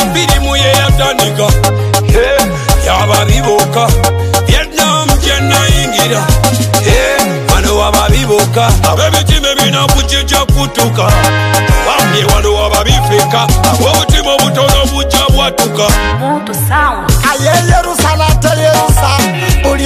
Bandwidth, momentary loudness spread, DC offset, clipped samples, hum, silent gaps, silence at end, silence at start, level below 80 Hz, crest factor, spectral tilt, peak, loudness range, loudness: 16 kHz; 2 LU; under 0.1%; under 0.1%; none; none; 0 s; 0 s; -16 dBFS; 8 dB; -4 dB/octave; 0 dBFS; 1 LU; -9 LUFS